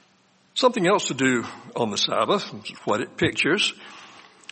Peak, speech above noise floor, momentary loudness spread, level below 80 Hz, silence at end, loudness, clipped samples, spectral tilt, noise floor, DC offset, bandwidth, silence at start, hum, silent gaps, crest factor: -6 dBFS; 37 dB; 15 LU; -62 dBFS; 0.35 s; -23 LUFS; under 0.1%; -3.5 dB/octave; -61 dBFS; under 0.1%; 8.8 kHz; 0.55 s; none; none; 20 dB